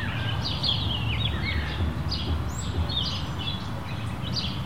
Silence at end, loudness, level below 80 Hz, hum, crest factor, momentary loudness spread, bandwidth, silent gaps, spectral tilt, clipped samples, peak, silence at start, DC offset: 0 s; -28 LUFS; -36 dBFS; none; 16 dB; 7 LU; 16 kHz; none; -5 dB/octave; under 0.1%; -12 dBFS; 0 s; 1%